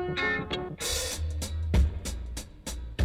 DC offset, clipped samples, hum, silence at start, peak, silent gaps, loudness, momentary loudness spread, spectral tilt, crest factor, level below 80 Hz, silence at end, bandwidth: under 0.1%; under 0.1%; none; 0 s; -14 dBFS; none; -31 LUFS; 12 LU; -4 dB/octave; 16 dB; -34 dBFS; 0 s; 16 kHz